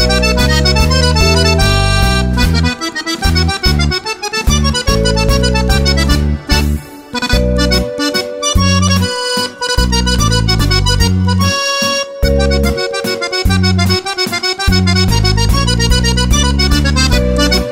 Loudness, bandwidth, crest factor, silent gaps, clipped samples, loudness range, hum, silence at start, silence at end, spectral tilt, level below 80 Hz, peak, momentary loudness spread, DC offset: -12 LUFS; 16.5 kHz; 12 dB; none; under 0.1%; 2 LU; none; 0 s; 0 s; -4.5 dB/octave; -16 dBFS; 0 dBFS; 5 LU; under 0.1%